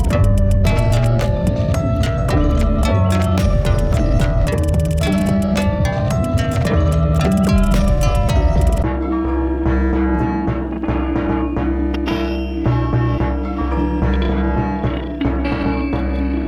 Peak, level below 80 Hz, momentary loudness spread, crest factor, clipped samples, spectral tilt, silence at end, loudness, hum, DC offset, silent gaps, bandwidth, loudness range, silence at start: -4 dBFS; -20 dBFS; 5 LU; 12 dB; under 0.1%; -7.5 dB/octave; 0 s; -18 LUFS; none; under 0.1%; none; 15.5 kHz; 3 LU; 0 s